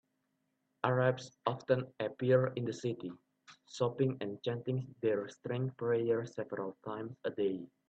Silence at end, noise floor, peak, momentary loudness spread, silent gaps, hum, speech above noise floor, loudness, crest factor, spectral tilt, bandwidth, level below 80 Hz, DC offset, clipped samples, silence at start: 0.2 s; -81 dBFS; -14 dBFS; 11 LU; none; none; 46 dB; -36 LUFS; 22 dB; -7 dB/octave; 8.2 kHz; -76 dBFS; under 0.1%; under 0.1%; 0.85 s